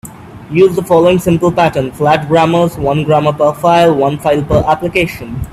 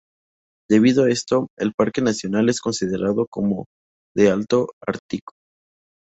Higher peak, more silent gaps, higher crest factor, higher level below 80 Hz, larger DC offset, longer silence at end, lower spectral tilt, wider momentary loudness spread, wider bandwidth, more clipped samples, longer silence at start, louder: first, 0 dBFS vs -4 dBFS; second, none vs 1.50-1.57 s, 1.74-1.78 s, 3.27-3.32 s, 3.66-4.15 s, 4.73-4.81 s, 4.99-5.09 s; second, 12 dB vs 18 dB; first, -34 dBFS vs -56 dBFS; neither; second, 0 s vs 0.85 s; about the same, -6.5 dB/octave vs -5.5 dB/octave; second, 6 LU vs 12 LU; first, 14.5 kHz vs 8.2 kHz; neither; second, 0.05 s vs 0.7 s; first, -11 LUFS vs -20 LUFS